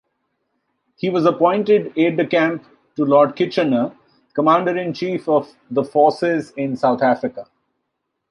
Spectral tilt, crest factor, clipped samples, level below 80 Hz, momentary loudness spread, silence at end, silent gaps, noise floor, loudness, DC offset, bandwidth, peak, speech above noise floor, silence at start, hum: -7.5 dB/octave; 16 dB; under 0.1%; -68 dBFS; 10 LU; 0.85 s; none; -76 dBFS; -18 LUFS; under 0.1%; 10.5 kHz; -2 dBFS; 58 dB; 1.05 s; none